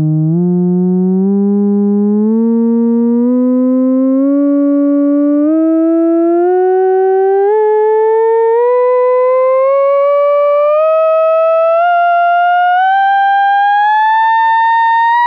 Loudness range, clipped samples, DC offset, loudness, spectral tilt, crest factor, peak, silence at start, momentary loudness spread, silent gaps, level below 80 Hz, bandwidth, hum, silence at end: 2 LU; under 0.1%; under 0.1%; -10 LUFS; -10 dB/octave; 4 dB; -4 dBFS; 0 s; 2 LU; none; -76 dBFS; 5 kHz; none; 0 s